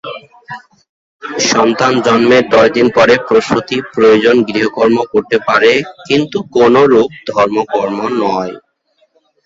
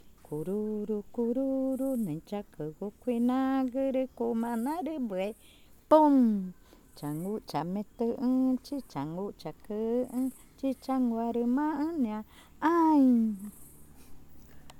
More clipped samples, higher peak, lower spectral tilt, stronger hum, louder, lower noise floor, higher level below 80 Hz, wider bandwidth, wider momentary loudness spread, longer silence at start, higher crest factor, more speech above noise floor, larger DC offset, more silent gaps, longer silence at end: neither; first, 0 dBFS vs -10 dBFS; second, -4.5 dB/octave vs -7.5 dB/octave; neither; first, -11 LUFS vs -30 LUFS; first, -58 dBFS vs -50 dBFS; first, -50 dBFS vs -62 dBFS; second, 7.8 kHz vs 17 kHz; about the same, 15 LU vs 15 LU; about the same, 0.05 s vs 0.05 s; second, 12 dB vs 22 dB; first, 47 dB vs 21 dB; neither; first, 0.89-1.19 s vs none; first, 0.85 s vs 0 s